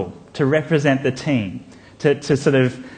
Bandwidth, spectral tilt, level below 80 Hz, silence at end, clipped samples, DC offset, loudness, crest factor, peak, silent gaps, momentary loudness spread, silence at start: 9.6 kHz; -6.5 dB/octave; -54 dBFS; 0 s; under 0.1%; under 0.1%; -19 LUFS; 18 dB; -2 dBFS; none; 10 LU; 0 s